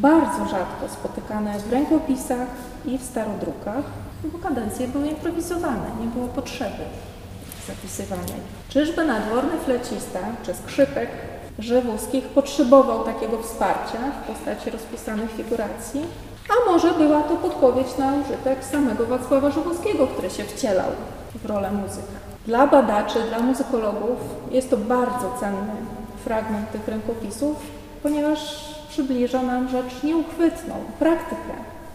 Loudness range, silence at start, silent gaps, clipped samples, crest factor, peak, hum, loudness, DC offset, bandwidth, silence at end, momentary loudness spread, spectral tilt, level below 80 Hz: 6 LU; 0 s; none; under 0.1%; 22 dB; -2 dBFS; none; -23 LUFS; under 0.1%; 15.5 kHz; 0 s; 14 LU; -5.5 dB/octave; -44 dBFS